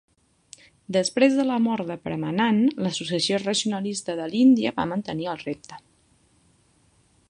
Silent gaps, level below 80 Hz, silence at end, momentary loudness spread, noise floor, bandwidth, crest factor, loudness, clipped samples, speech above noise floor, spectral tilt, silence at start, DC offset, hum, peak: none; -64 dBFS; 1.5 s; 11 LU; -62 dBFS; 11 kHz; 20 dB; -23 LUFS; under 0.1%; 39 dB; -4.5 dB/octave; 0.9 s; under 0.1%; none; -4 dBFS